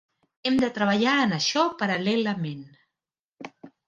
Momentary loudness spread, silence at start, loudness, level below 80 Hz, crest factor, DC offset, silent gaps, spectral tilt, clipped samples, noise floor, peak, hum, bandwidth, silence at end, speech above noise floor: 22 LU; 0.45 s; -24 LUFS; -66 dBFS; 20 dB; under 0.1%; 3.19-3.29 s; -4.5 dB/octave; under 0.1%; -89 dBFS; -8 dBFS; none; 9.4 kHz; 0.2 s; 65 dB